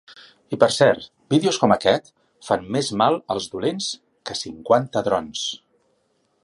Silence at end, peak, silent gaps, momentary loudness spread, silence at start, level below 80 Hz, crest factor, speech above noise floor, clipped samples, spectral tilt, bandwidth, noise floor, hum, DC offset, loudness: 0.85 s; 0 dBFS; none; 12 LU; 0.1 s; -58 dBFS; 22 dB; 46 dB; under 0.1%; -4.5 dB/octave; 11.5 kHz; -67 dBFS; none; under 0.1%; -21 LUFS